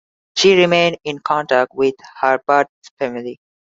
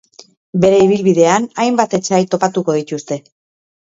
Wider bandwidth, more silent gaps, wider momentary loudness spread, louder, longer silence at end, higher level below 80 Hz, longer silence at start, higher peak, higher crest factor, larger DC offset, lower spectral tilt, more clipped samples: about the same, 7.8 kHz vs 7.8 kHz; first, 2.69-2.82 s, 2.91-2.97 s vs none; about the same, 13 LU vs 12 LU; second, -17 LUFS vs -14 LUFS; second, 0.45 s vs 0.75 s; second, -62 dBFS vs -56 dBFS; second, 0.35 s vs 0.55 s; about the same, -2 dBFS vs 0 dBFS; about the same, 16 dB vs 14 dB; neither; second, -4 dB/octave vs -5.5 dB/octave; neither